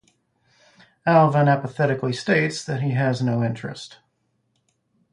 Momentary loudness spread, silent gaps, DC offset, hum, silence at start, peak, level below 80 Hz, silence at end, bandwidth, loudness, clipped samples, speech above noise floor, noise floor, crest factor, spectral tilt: 15 LU; none; under 0.1%; none; 1.05 s; -4 dBFS; -62 dBFS; 1.25 s; 10.5 kHz; -21 LUFS; under 0.1%; 50 dB; -71 dBFS; 18 dB; -6.5 dB/octave